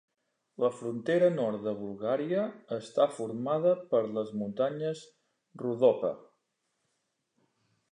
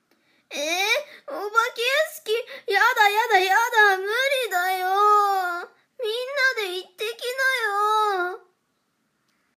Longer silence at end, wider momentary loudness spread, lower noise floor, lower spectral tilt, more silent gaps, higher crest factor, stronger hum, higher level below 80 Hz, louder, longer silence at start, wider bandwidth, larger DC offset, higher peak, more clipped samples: first, 1.75 s vs 1.2 s; second, 10 LU vs 13 LU; first, -80 dBFS vs -72 dBFS; first, -7 dB/octave vs 1.5 dB/octave; neither; about the same, 20 dB vs 18 dB; neither; first, -80 dBFS vs -86 dBFS; second, -30 LUFS vs -21 LUFS; about the same, 0.6 s vs 0.5 s; second, 10 kHz vs 15.5 kHz; neither; second, -12 dBFS vs -4 dBFS; neither